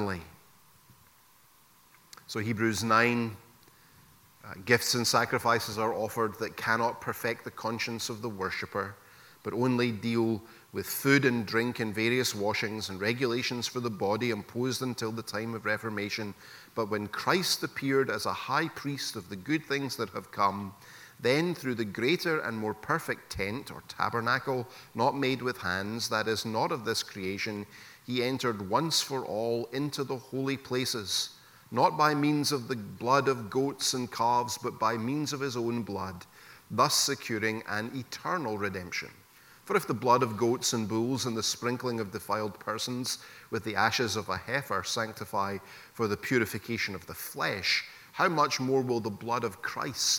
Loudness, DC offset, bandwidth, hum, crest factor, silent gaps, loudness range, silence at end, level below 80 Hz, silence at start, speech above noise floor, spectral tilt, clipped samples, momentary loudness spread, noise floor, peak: -30 LUFS; under 0.1%; 17.5 kHz; none; 24 dB; none; 3 LU; 0 s; -66 dBFS; 0 s; 31 dB; -4 dB/octave; under 0.1%; 10 LU; -61 dBFS; -8 dBFS